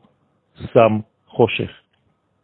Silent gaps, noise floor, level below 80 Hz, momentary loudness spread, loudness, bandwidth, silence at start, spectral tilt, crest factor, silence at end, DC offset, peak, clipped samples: none; -65 dBFS; -54 dBFS; 15 LU; -19 LUFS; 4.4 kHz; 0.6 s; -10 dB/octave; 20 dB; 0.75 s; under 0.1%; 0 dBFS; under 0.1%